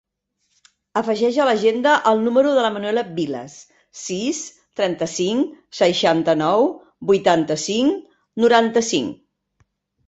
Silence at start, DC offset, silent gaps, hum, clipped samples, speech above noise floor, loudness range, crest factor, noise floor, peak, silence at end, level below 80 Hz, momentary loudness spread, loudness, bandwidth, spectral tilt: 0.95 s; under 0.1%; none; none; under 0.1%; 53 dB; 4 LU; 18 dB; -71 dBFS; -2 dBFS; 0.95 s; -62 dBFS; 13 LU; -19 LUFS; 8.2 kHz; -4 dB/octave